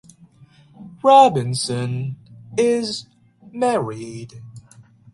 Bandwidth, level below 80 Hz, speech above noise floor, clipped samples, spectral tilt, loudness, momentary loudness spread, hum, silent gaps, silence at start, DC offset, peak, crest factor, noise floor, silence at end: 11.5 kHz; -60 dBFS; 32 dB; under 0.1%; -5 dB/octave; -19 LUFS; 25 LU; none; none; 0.8 s; under 0.1%; 0 dBFS; 20 dB; -50 dBFS; 0.55 s